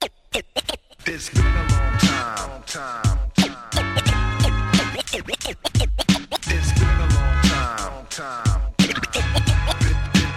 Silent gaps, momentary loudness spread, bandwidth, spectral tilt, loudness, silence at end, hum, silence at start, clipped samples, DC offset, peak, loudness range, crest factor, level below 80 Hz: none; 10 LU; 15 kHz; -4.5 dB/octave; -21 LUFS; 0 s; none; 0 s; under 0.1%; under 0.1%; -2 dBFS; 1 LU; 18 dB; -24 dBFS